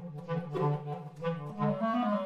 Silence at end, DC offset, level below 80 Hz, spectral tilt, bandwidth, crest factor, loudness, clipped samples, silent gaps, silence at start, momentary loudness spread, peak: 0 s; under 0.1%; -72 dBFS; -9 dB/octave; 6.8 kHz; 14 dB; -34 LUFS; under 0.1%; none; 0 s; 7 LU; -18 dBFS